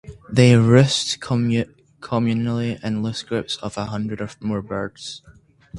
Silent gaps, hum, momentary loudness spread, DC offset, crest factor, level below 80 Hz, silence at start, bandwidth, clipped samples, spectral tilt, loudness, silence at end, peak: none; none; 14 LU; under 0.1%; 20 dB; -50 dBFS; 0.05 s; 11.5 kHz; under 0.1%; -6 dB/octave; -20 LUFS; 0 s; 0 dBFS